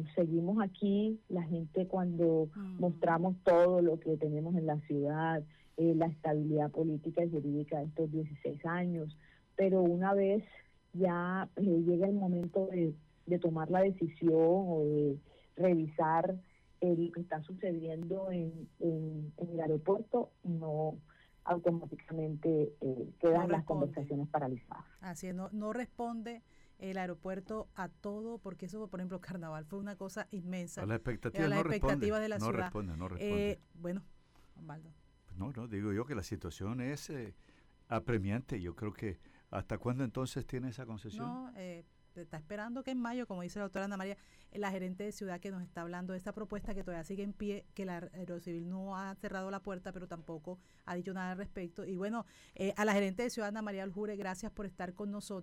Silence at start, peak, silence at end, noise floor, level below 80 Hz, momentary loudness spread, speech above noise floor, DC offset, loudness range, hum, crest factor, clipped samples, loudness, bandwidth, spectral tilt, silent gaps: 0 s; -20 dBFS; 0 s; -60 dBFS; -58 dBFS; 14 LU; 24 dB; under 0.1%; 11 LU; none; 16 dB; under 0.1%; -36 LUFS; 15 kHz; -7.5 dB/octave; none